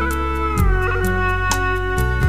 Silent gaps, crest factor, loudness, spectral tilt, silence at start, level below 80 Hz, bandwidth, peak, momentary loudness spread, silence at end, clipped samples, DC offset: none; 14 dB; -19 LUFS; -5.5 dB/octave; 0 s; -22 dBFS; 16 kHz; -4 dBFS; 2 LU; 0 s; under 0.1%; 2%